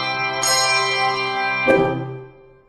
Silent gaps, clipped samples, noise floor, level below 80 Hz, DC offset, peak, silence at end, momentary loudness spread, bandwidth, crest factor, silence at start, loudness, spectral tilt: none; under 0.1%; -42 dBFS; -52 dBFS; under 0.1%; -2 dBFS; 0.4 s; 12 LU; 15.5 kHz; 18 dB; 0 s; -18 LUFS; -2.5 dB/octave